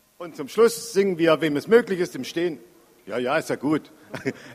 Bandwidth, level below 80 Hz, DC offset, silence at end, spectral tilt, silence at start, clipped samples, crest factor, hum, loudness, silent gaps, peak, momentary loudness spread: 15.5 kHz; -68 dBFS; under 0.1%; 0 s; -5 dB/octave; 0.2 s; under 0.1%; 20 dB; none; -23 LUFS; none; -4 dBFS; 13 LU